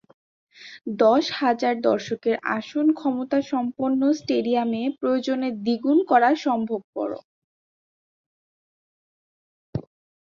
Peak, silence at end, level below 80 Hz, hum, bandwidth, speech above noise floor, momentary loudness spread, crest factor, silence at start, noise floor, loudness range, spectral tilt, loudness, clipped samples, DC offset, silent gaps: -6 dBFS; 0.45 s; -64 dBFS; none; 7.4 kHz; over 68 dB; 15 LU; 18 dB; 0.6 s; under -90 dBFS; 11 LU; -6 dB/octave; -23 LUFS; under 0.1%; under 0.1%; 6.84-6.93 s, 7.24-9.73 s